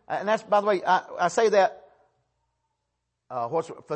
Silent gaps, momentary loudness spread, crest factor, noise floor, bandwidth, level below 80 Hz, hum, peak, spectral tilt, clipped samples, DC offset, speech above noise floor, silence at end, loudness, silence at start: none; 9 LU; 18 dB; -80 dBFS; 8.8 kHz; -76 dBFS; none; -10 dBFS; -4 dB/octave; under 0.1%; under 0.1%; 56 dB; 0 s; -24 LUFS; 0.1 s